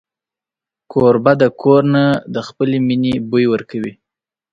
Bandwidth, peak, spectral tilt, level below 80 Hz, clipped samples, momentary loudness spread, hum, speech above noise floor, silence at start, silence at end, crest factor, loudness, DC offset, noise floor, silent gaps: 7.6 kHz; 0 dBFS; -8 dB/octave; -52 dBFS; under 0.1%; 13 LU; none; 74 dB; 0.9 s; 0.6 s; 16 dB; -15 LUFS; under 0.1%; -88 dBFS; none